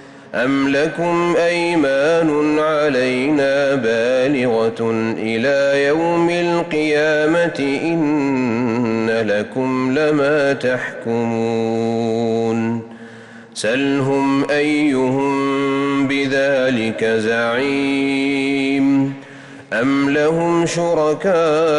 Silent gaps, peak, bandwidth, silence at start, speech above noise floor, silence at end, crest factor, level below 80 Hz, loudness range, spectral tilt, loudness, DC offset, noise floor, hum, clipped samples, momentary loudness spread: none; -8 dBFS; 11 kHz; 0 s; 22 dB; 0 s; 8 dB; -56 dBFS; 3 LU; -5.5 dB/octave; -17 LUFS; under 0.1%; -38 dBFS; none; under 0.1%; 5 LU